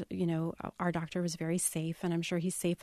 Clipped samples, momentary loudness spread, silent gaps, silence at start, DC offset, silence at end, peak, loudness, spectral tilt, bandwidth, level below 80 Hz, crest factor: under 0.1%; 4 LU; none; 0 s; under 0.1%; 0 s; -18 dBFS; -34 LUFS; -5 dB/octave; 13.5 kHz; -64 dBFS; 16 dB